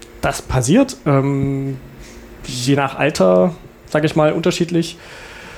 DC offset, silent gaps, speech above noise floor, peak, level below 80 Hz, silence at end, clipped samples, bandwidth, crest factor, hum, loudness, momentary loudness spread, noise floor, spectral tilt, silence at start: under 0.1%; none; 21 dB; -2 dBFS; -40 dBFS; 0 s; under 0.1%; 17.5 kHz; 14 dB; none; -17 LUFS; 20 LU; -37 dBFS; -6 dB/octave; 0 s